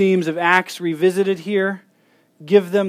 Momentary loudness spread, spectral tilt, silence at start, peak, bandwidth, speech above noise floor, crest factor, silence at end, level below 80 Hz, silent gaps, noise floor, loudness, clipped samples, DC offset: 8 LU; -6 dB/octave; 0 s; 0 dBFS; 15.5 kHz; 41 dB; 18 dB; 0 s; -78 dBFS; none; -58 dBFS; -18 LUFS; under 0.1%; under 0.1%